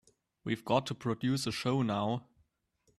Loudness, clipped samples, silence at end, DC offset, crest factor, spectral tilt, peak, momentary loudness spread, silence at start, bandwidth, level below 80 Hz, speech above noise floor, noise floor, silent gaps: -33 LUFS; under 0.1%; 0.75 s; under 0.1%; 22 dB; -6 dB/octave; -14 dBFS; 7 LU; 0.45 s; 13.5 kHz; -68 dBFS; 42 dB; -75 dBFS; none